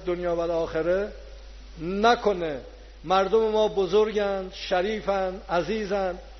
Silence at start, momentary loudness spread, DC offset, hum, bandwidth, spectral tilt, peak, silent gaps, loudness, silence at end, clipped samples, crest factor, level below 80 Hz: 0 s; 11 LU; under 0.1%; none; 6.4 kHz; -3.5 dB/octave; -6 dBFS; none; -25 LUFS; 0 s; under 0.1%; 18 dB; -46 dBFS